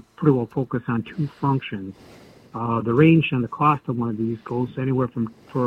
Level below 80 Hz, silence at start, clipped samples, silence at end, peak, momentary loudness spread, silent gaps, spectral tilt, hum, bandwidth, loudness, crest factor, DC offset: -56 dBFS; 0.2 s; under 0.1%; 0 s; -4 dBFS; 13 LU; none; -9.5 dB/octave; none; 5.6 kHz; -22 LUFS; 18 dB; under 0.1%